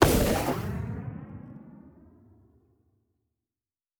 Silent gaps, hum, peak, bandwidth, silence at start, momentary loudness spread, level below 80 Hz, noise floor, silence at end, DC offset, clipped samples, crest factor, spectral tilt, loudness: none; none; -2 dBFS; over 20 kHz; 0 s; 24 LU; -40 dBFS; under -90 dBFS; 2.1 s; under 0.1%; under 0.1%; 28 dB; -5 dB/octave; -29 LUFS